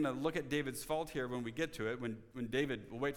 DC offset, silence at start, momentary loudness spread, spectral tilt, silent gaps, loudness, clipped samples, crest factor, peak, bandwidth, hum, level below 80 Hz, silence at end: under 0.1%; 0 s; 5 LU; -5 dB/octave; none; -39 LUFS; under 0.1%; 16 dB; -22 dBFS; 18.5 kHz; none; -62 dBFS; 0 s